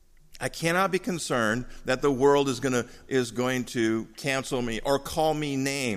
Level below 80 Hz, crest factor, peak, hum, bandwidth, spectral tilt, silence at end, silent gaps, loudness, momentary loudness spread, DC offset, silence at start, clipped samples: -48 dBFS; 18 dB; -8 dBFS; none; 15.5 kHz; -4.5 dB/octave; 0 s; none; -27 LUFS; 7 LU; under 0.1%; 0.3 s; under 0.1%